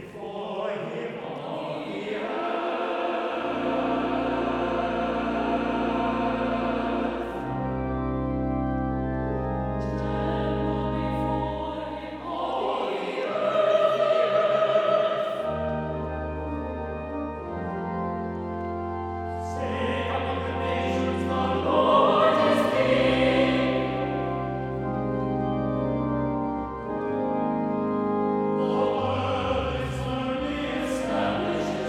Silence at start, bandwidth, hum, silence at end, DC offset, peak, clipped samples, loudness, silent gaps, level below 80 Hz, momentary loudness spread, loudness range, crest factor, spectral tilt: 0 s; 13 kHz; none; 0 s; under 0.1%; -8 dBFS; under 0.1%; -26 LUFS; none; -42 dBFS; 10 LU; 8 LU; 18 dB; -7 dB/octave